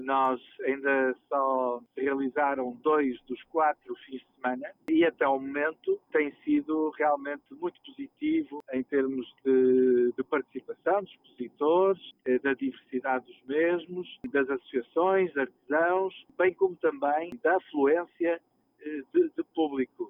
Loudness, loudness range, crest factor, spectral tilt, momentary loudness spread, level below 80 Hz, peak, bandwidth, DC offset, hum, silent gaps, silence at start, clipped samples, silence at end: -28 LUFS; 3 LU; 16 dB; -8 dB/octave; 12 LU; -74 dBFS; -12 dBFS; 3.8 kHz; under 0.1%; none; none; 0 s; under 0.1%; 0 s